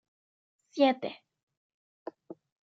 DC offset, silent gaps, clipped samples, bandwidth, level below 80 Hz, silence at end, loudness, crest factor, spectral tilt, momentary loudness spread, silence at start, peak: under 0.1%; 1.43-1.47 s, 1.57-2.06 s; under 0.1%; 7.4 kHz; under -90 dBFS; 0.4 s; -29 LUFS; 24 dB; -5 dB/octave; 25 LU; 0.75 s; -12 dBFS